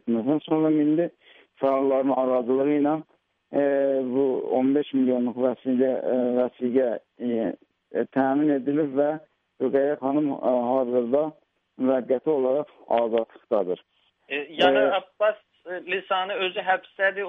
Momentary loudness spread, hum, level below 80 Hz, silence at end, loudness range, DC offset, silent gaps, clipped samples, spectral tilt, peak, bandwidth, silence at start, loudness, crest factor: 8 LU; none; -74 dBFS; 0 s; 2 LU; under 0.1%; none; under 0.1%; -8 dB/octave; -6 dBFS; 4.6 kHz; 0.05 s; -24 LUFS; 18 dB